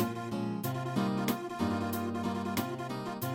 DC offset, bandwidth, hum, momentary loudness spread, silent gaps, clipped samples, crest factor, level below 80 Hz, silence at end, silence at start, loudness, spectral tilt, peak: under 0.1%; 17 kHz; none; 5 LU; none; under 0.1%; 16 dB; -64 dBFS; 0 s; 0 s; -34 LUFS; -6 dB/octave; -16 dBFS